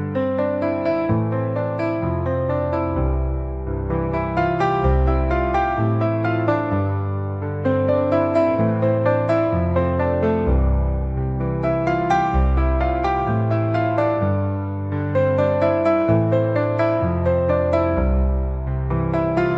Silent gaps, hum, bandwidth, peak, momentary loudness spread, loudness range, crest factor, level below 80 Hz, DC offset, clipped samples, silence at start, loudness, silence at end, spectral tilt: none; none; 6.2 kHz; -6 dBFS; 5 LU; 3 LU; 14 dB; -28 dBFS; 0.2%; under 0.1%; 0 s; -20 LUFS; 0 s; -9.5 dB/octave